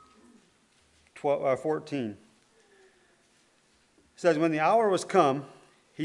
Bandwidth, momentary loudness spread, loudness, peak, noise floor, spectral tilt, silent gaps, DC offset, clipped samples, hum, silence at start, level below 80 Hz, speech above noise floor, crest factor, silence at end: 11.5 kHz; 11 LU; -27 LUFS; -6 dBFS; -66 dBFS; -5.5 dB/octave; none; under 0.1%; under 0.1%; none; 1.15 s; -78 dBFS; 40 dB; 22 dB; 0 s